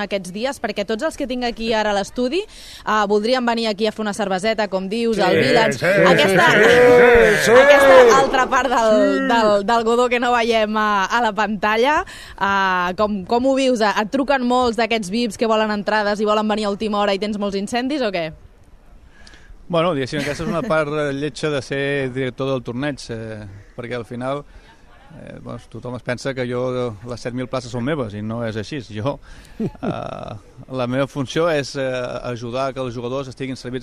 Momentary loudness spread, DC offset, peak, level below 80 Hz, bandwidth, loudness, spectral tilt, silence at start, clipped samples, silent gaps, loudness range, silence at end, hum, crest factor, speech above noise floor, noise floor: 16 LU; under 0.1%; 0 dBFS; -44 dBFS; 14 kHz; -18 LUFS; -4.5 dB/octave; 0 s; under 0.1%; none; 15 LU; 0 s; none; 18 dB; 27 dB; -45 dBFS